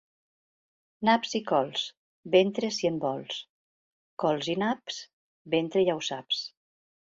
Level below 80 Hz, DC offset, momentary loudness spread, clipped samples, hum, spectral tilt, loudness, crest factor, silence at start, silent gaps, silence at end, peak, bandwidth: -74 dBFS; under 0.1%; 13 LU; under 0.1%; none; -4.5 dB/octave; -28 LUFS; 20 dB; 1 s; 1.97-2.23 s, 3.49-4.17 s, 5.13-5.45 s; 0.65 s; -8 dBFS; 7.8 kHz